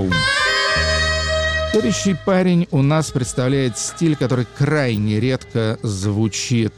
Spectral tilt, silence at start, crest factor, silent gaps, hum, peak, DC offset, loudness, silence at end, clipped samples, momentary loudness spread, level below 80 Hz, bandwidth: -5 dB/octave; 0 s; 10 dB; none; none; -8 dBFS; under 0.1%; -18 LUFS; 0.05 s; under 0.1%; 5 LU; -34 dBFS; 16 kHz